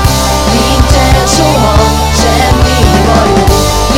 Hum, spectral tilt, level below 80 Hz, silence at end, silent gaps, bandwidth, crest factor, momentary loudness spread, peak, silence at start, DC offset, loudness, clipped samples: none; -4.5 dB/octave; -12 dBFS; 0 s; none; 17 kHz; 8 dB; 2 LU; 0 dBFS; 0 s; 2%; -8 LUFS; 2%